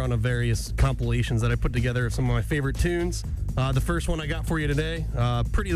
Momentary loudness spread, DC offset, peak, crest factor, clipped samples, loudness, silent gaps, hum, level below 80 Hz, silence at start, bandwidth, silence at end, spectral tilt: 3 LU; under 0.1%; -10 dBFS; 14 dB; under 0.1%; -26 LUFS; none; none; -30 dBFS; 0 s; 14.5 kHz; 0 s; -6 dB/octave